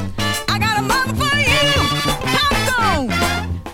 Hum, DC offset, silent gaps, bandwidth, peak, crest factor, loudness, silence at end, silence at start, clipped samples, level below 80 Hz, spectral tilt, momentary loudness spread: none; under 0.1%; none; 17.5 kHz; -2 dBFS; 14 dB; -16 LUFS; 0 s; 0 s; under 0.1%; -32 dBFS; -3.5 dB/octave; 6 LU